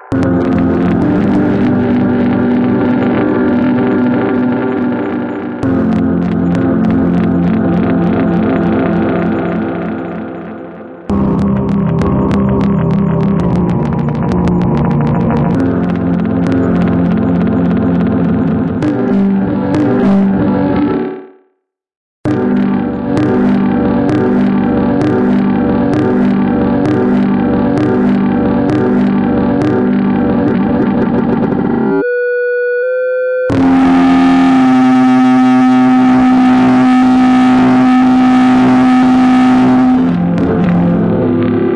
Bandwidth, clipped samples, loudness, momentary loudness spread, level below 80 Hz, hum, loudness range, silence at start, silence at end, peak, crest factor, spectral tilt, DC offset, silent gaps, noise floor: 7.6 kHz; under 0.1%; -11 LUFS; 6 LU; -36 dBFS; none; 6 LU; 0 s; 0 s; 0 dBFS; 10 dB; -9 dB/octave; under 0.1%; 21.97-22.24 s; -64 dBFS